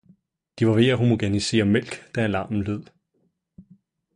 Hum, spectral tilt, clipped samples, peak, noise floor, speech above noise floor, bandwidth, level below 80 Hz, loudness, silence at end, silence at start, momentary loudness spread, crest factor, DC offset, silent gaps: none; -6 dB/octave; under 0.1%; -6 dBFS; -70 dBFS; 49 dB; 11 kHz; -50 dBFS; -22 LUFS; 0.55 s; 0.55 s; 10 LU; 18 dB; under 0.1%; none